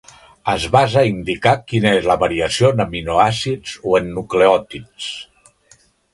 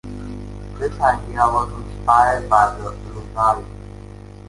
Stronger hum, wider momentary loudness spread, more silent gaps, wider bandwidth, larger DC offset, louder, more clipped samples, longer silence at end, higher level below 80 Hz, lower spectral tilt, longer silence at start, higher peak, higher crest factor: second, none vs 50 Hz at -35 dBFS; second, 13 LU vs 21 LU; neither; about the same, 11.5 kHz vs 11.5 kHz; neither; about the same, -17 LUFS vs -18 LUFS; neither; first, 0.9 s vs 0 s; second, -42 dBFS vs -36 dBFS; about the same, -5.5 dB/octave vs -6 dB/octave; first, 0.45 s vs 0.05 s; about the same, 0 dBFS vs 0 dBFS; about the same, 18 dB vs 20 dB